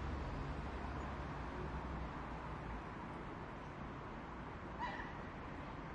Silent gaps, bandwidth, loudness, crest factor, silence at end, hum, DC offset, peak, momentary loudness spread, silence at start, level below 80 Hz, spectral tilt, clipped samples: none; 9.6 kHz; -47 LUFS; 14 dB; 0 s; none; under 0.1%; -32 dBFS; 4 LU; 0 s; -52 dBFS; -7 dB/octave; under 0.1%